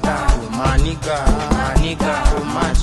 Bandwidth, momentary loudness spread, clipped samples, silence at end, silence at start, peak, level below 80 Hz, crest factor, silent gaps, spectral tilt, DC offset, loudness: 12 kHz; 2 LU; under 0.1%; 0 s; 0 s; 0 dBFS; -18 dBFS; 16 dB; none; -5.5 dB/octave; under 0.1%; -19 LUFS